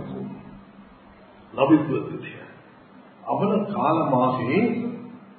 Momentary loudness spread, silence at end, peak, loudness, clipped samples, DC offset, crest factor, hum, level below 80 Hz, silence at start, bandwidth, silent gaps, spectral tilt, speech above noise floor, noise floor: 20 LU; 0.15 s; -4 dBFS; -23 LUFS; under 0.1%; under 0.1%; 20 dB; none; -64 dBFS; 0 s; 4.5 kHz; none; -12 dB/octave; 27 dB; -49 dBFS